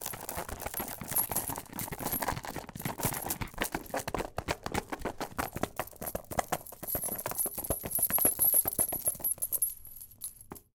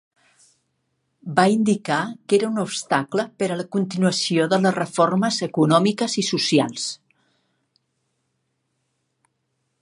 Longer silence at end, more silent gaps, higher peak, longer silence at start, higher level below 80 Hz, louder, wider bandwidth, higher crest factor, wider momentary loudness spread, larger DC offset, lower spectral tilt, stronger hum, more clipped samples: second, 0.15 s vs 2.85 s; neither; second, -10 dBFS vs -2 dBFS; second, 0 s vs 1.25 s; first, -52 dBFS vs -70 dBFS; second, -32 LUFS vs -21 LUFS; first, 19 kHz vs 11.5 kHz; about the same, 24 dB vs 20 dB; first, 14 LU vs 8 LU; neither; second, -2.5 dB/octave vs -4.5 dB/octave; neither; neither